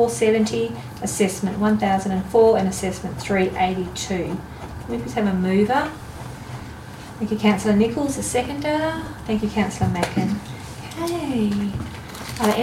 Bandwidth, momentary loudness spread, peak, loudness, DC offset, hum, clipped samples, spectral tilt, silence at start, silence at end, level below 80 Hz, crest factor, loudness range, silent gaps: 16 kHz; 16 LU; -6 dBFS; -22 LUFS; under 0.1%; none; under 0.1%; -5.5 dB/octave; 0 s; 0 s; -44 dBFS; 16 dB; 4 LU; none